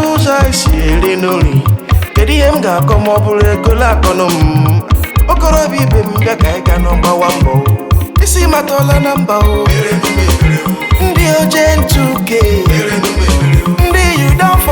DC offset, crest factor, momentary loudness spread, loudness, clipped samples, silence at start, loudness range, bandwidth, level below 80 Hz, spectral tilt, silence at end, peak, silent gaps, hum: under 0.1%; 10 dB; 3 LU; -10 LUFS; under 0.1%; 0 s; 1 LU; over 20 kHz; -14 dBFS; -5.5 dB/octave; 0 s; 0 dBFS; none; none